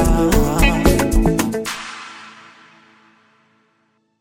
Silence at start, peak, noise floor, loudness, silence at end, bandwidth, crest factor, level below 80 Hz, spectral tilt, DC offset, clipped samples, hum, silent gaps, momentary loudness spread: 0 s; 0 dBFS; -64 dBFS; -17 LUFS; 1.9 s; 17 kHz; 18 dB; -22 dBFS; -5 dB/octave; under 0.1%; under 0.1%; none; none; 20 LU